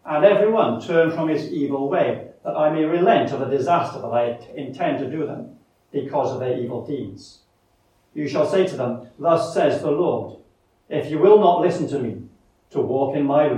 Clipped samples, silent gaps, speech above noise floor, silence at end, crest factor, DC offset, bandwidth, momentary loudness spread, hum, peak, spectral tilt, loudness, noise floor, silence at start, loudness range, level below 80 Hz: under 0.1%; none; 42 dB; 0 s; 18 dB; under 0.1%; 10.5 kHz; 14 LU; none; -2 dBFS; -7 dB/octave; -21 LUFS; -62 dBFS; 0.05 s; 7 LU; -66 dBFS